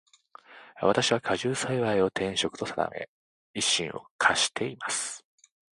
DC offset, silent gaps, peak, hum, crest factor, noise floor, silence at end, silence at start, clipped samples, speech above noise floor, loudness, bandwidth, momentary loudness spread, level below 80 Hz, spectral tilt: under 0.1%; 3.08-3.54 s, 4.11-4.19 s; -8 dBFS; none; 22 dB; -53 dBFS; 0.6 s; 0.5 s; under 0.1%; 26 dB; -27 LUFS; 11.5 kHz; 12 LU; -62 dBFS; -2.5 dB/octave